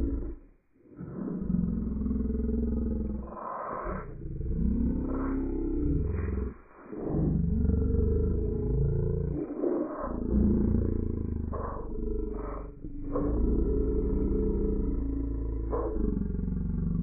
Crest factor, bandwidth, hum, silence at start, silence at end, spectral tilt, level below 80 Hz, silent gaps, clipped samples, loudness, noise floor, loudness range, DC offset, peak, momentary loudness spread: 16 dB; 2.6 kHz; none; 0 s; 0 s; -9.5 dB/octave; -32 dBFS; none; under 0.1%; -31 LUFS; -58 dBFS; 3 LU; under 0.1%; -12 dBFS; 10 LU